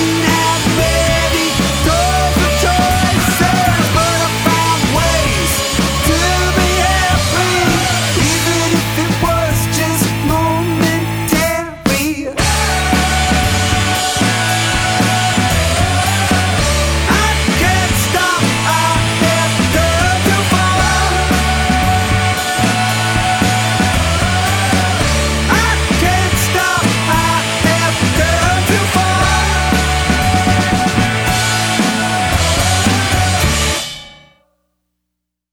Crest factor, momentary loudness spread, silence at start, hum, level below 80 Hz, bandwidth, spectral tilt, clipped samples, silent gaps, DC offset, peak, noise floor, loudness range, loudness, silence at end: 14 dB; 2 LU; 0 s; none; -24 dBFS; over 20 kHz; -4 dB/octave; under 0.1%; none; under 0.1%; 0 dBFS; -76 dBFS; 2 LU; -13 LUFS; 1.4 s